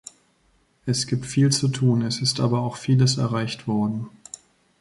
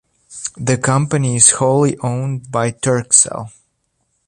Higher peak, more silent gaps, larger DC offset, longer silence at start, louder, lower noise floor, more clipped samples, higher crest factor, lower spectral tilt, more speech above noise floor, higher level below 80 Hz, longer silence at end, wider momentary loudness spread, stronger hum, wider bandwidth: second, -8 dBFS vs 0 dBFS; neither; neither; first, 0.85 s vs 0.3 s; second, -22 LUFS vs -14 LUFS; about the same, -64 dBFS vs -67 dBFS; neither; about the same, 16 dB vs 16 dB; about the same, -5 dB/octave vs -4 dB/octave; second, 42 dB vs 51 dB; second, -58 dBFS vs -52 dBFS; about the same, 0.7 s vs 0.8 s; about the same, 16 LU vs 16 LU; neither; about the same, 11.5 kHz vs 11.5 kHz